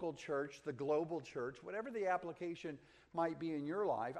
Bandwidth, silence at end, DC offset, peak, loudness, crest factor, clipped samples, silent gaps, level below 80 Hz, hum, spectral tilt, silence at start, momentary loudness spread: 10.5 kHz; 0 s; under 0.1%; -24 dBFS; -42 LUFS; 16 dB; under 0.1%; none; -78 dBFS; none; -6.5 dB/octave; 0 s; 8 LU